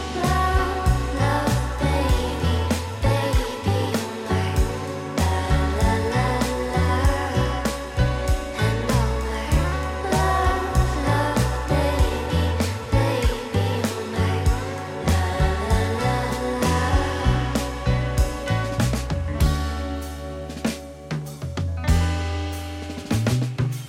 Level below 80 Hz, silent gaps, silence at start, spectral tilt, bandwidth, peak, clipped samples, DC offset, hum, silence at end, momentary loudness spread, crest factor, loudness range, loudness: -28 dBFS; none; 0 s; -5.5 dB/octave; 16.5 kHz; -8 dBFS; under 0.1%; under 0.1%; none; 0 s; 7 LU; 14 dB; 4 LU; -23 LUFS